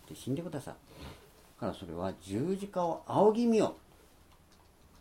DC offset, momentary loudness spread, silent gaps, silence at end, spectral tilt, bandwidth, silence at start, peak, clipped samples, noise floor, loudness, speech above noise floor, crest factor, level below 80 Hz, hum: under 0.1%; 23 LU; none; 1.25 s; -7 dB/octave; 16.5 kHz; 0.1 s; -14 dBFS; under 0.1%; -61 dBFS; -32 LUFS; 29 dB; 20 dB; -62 dBFS; none